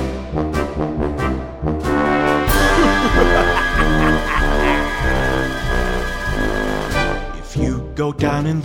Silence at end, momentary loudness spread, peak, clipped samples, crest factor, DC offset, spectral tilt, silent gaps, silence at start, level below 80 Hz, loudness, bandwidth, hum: 0 s; 8 LU; 0 dBFS; under 0.1%; 16 dB; under 0.1%; -5.5 dB/octave; none; 0 s; -22 dBFS; -18 LUFS; 16.5 kHz; none